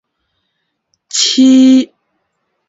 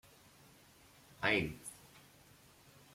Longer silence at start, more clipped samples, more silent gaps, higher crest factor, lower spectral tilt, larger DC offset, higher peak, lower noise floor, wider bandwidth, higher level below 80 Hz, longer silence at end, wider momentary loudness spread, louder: about the same, 1.15 s vs 1.2 s; neither; neither; second, 12 dB vs 24 dB; second, -2 dB/octave vs -4 dB/octave; neither; first, 0 dBFS vs -20 dBFS; first, -69 dBFS vs -63 dBFS; second, 8 kHz vs 16.5 kHz; about the same, -62 dBFS vs -66 dBFS; about the same, 0.85 s vs 0.95 s; second, 12 LU vs 28 LU; first, -9 LUFS vs -37 LUFS